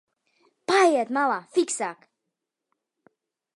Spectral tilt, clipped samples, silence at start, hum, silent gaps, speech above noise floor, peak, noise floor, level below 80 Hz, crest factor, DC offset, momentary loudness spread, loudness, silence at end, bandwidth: -2.5 dB/octave; under 0.1%; 0.7 s; none; none; 58 dB; -6 dBFS; -83 dBFS; -84 dBFS; 20 dB; under 0.1%; 12 LU; -23 LUFS; 1.65 s; 11.5 kHz